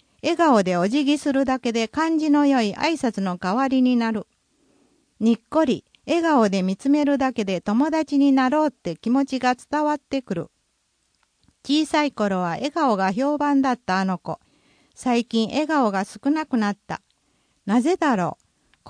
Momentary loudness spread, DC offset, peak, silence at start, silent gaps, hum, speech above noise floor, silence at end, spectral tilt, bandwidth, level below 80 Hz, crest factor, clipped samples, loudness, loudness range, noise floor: 9 LU; under 0.1%; -8 dBFS; 0.25 s; none; none; 49 dB; 0 s; -5.5 dB/octave; 10.5 kHz; -62 dBFS; 14 dB; under 0.1%; -22 LUFS; 4 LU; -69 dBFS